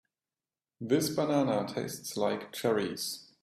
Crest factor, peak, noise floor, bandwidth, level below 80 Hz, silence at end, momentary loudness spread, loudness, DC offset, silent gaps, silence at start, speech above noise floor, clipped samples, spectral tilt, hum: 18 dB; -14 dBFS; under -90 dBFS; 15.5 kHz; -72 dBFS; 0.2 s; 8 LU; -31 LUFS; under 0.1%; none; 0.8 s; over 59 dB; under 0.1%; -4.5 dB/octave; none